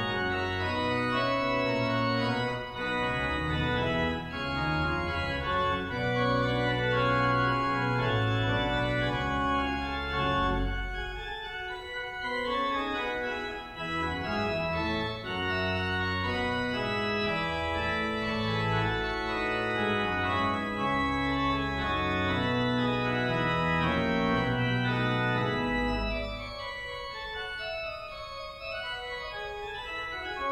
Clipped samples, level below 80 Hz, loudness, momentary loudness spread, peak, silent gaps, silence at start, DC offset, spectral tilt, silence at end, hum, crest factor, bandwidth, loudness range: under 0.1%; -44 dBFS; -29 LUFS; 9 LU; -14 dBFS; none; 0 s; under 0.1%; -6.5 dB/octave; 0 s; none; 16 dB; 12.5 kHz; 5 LU